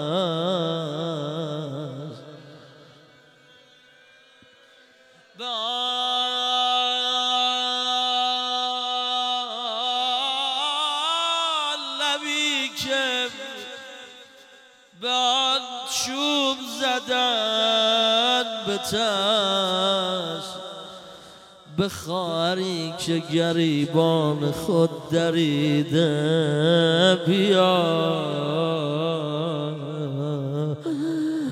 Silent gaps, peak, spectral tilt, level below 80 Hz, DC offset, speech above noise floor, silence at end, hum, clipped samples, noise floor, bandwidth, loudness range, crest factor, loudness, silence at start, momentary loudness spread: none; -6 dBFS; -4.5 dB/octave; -66 dBFS; under 0.1%; 33 dB; 0 s; none; under 0.1%; -54 dBFS; 16 kHz; 8 LU; 18 dB; -23 LUFS; 0 s; 11 LU